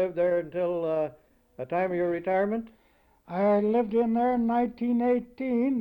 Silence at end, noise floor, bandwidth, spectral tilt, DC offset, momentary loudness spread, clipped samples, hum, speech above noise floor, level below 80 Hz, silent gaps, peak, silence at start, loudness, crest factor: 0 s; -62 dBFS; 16.5 kHz; -9.5 dB/octave; under 0.1%; 7 LU; under 0.1%; none; 35 dB; -60 dBFS; none; -14 dBFS; 0 s; -27 LUFS; 12 dB